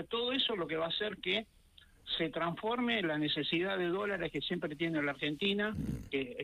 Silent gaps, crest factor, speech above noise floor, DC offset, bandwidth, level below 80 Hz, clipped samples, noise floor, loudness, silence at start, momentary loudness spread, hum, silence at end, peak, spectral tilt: none; 16 dB; 27 dB; under 0.1%; 15 kHz; -60 dBFS; under 0.1%; -62 dBFS; -34 LUFS; 0 s; 5 LU; none; 0 s; -20 dBFS; -6 dB/octave